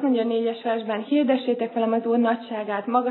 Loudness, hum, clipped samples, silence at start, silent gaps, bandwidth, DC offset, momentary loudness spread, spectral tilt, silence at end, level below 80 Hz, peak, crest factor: -24 LUFS; none; under 0.1%; 0 s; none; 4.3 kHz; under 0.1%; 6 LU; -9.5 dB/octave; 0 s; under -90 dBFS; -8 dBFS; 16 dB